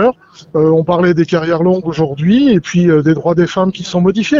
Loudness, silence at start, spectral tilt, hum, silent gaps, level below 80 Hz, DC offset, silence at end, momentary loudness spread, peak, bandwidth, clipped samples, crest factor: -12 LUFS; 0 s; -7 dB/octave; none; none; -46 dBFS; under 0.1%; 0 s; 5 LU; 0 dBFS; 7.4 kHz; under 0.1%; 10 dB